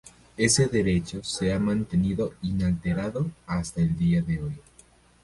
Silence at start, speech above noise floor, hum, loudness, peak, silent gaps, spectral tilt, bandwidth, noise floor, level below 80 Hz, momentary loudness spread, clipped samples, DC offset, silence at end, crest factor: 0.05 s; 31 dB; none; -26 LUFS; -6 dBFS; none; -5 dB/octave; 11.5 kHz; -56 dBFS; -44 dBFS; 10 LU; under 0.1%; under 0.1%; 0.65 s; 20 dB